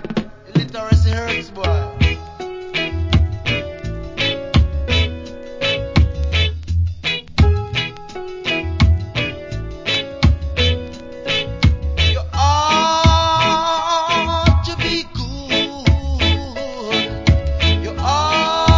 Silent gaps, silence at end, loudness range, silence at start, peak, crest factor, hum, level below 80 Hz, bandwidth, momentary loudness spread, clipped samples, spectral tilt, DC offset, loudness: none; 0 s; 4 LU; 0 s; 0 dBFS; 18 dB; none; -22 dBFS; 7.6 kHz; 11 LU; under 0.1%; -5 dB/octave; under 0.1%; -18 LUFS